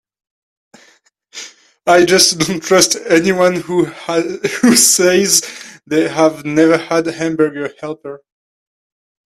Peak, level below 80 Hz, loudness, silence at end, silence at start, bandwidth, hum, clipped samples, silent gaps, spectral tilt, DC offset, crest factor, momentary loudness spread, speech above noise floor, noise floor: 0 dBFS; -56 dBFS; -12 LUFS; 1.1 s; 1.35 s; 16 kHz; none; under 0.1%; none; -3 dB/octave; under 0.1%; 16 dB; 20 LU; 39 dB; -53 dBFS